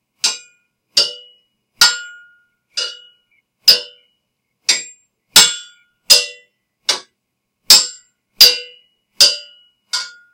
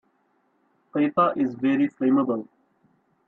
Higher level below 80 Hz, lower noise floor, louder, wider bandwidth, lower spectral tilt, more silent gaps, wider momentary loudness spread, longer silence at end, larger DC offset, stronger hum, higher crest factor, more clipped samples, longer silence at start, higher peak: first, -58 dBFS vs -72 dBFS; first, -74 dBFS vs -68 dBFS; first, -12 LUFS vs -23 LUFS; first, over 20 kHz vs 4.1 kHz; second, 2.5 dB/octave vs -9 dB/octave; neither; first, 16 LU vs 8 LU; second, 0.25 s vs 0.85 s; neither; neither; about the same, 18 dB vs 16 dB; first, 0.4% vs under 0.1%; second, 0.25 s vs 0.95 s; first, 0 dBFS vs -8 dBFS